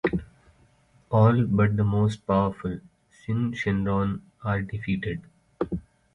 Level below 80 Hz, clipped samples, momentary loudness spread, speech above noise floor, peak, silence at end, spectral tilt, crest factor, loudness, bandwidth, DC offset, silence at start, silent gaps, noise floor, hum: -46 dBFS; under 0.1%; 13 LU; 37 dB; -8 dBFS; 0.35 s; -8.5 dB/octave; 18 dB; -26 LUFS; 8 kHz; under 0.1%; 0.05 s; none; -60 dBFS; none